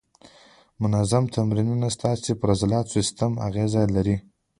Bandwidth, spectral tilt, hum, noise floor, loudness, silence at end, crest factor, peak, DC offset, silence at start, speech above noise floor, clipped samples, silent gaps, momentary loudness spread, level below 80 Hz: 11.5 kHz; -6.5 dB/octave; none; -54 dBFS; -24 LUFS; 0.4 s; 18 dB; -6 dBFS; under 0.1%; 0.8 s; 32 dB; under 0.1%; none; 4 LU; -46 dBFS